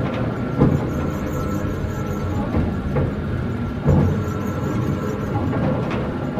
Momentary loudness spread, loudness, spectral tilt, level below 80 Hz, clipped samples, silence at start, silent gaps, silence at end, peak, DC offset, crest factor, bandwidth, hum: 6 LU; -22 LUFS; -8.5 dB/octave; -34 dBFS; under 0.1%; 0 s; none; 0 s; -2 dBFS; under 0.1%; 20 dB; 15 kHz; none